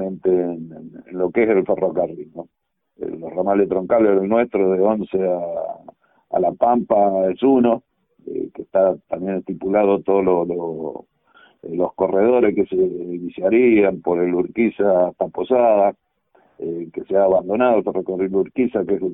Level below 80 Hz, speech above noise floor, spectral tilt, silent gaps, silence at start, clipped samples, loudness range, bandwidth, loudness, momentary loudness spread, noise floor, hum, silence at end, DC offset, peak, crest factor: -56 dBFS; 40 dB; -12 dB/octave; none; 0 s; under 0.1%; 3 LU; 3.8 kHz; -19 LUFS; 14 LU; -59 dBFS; none; 0 s; under 0.1%; -2 dBFS; 16 dB